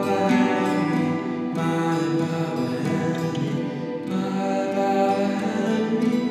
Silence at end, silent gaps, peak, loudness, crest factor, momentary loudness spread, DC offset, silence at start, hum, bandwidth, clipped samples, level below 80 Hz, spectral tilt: 0 s; none; -8 dBFS; -23 LUFS; 14 dB; 6 LU; under 0.1%; 0 s; none; 13.5 kHz; under 0.1%; -80 dBFS; -7 dB/octave